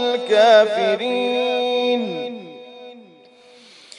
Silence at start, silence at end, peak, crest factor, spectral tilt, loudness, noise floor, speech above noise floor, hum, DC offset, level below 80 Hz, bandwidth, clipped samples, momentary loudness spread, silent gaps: 0 s; 1 s; -2 dBFS; 18 dB; -3.5 dB/octave; -17 LUFS; -48 dBFS; 32 dB; none; under 0.1%; -84 dBFS; 10.5 kHz; under 0.1%; 24 LU; none